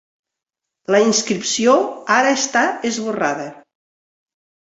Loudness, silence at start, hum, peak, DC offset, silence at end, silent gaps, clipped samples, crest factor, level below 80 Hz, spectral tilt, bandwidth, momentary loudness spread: -17 LUFS; 0.9 s; none; -2 dBFS; under 0.1%; 1.15 s; none; under 0.1%; 18 dB; -66 dBFS; -2.5 dB/octave; 8.2 kHz; 8 LU